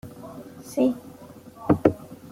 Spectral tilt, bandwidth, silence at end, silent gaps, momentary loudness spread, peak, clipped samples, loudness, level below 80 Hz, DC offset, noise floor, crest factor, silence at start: -7.5 dB/octave; 16.5 kHz; 0.15 s; none; 23 LU; -2 dBFS; under 0.1%; -24 LUFS; -54 dBFS; under 0.1%; -45 dBFS; 24 dB; 0.05 s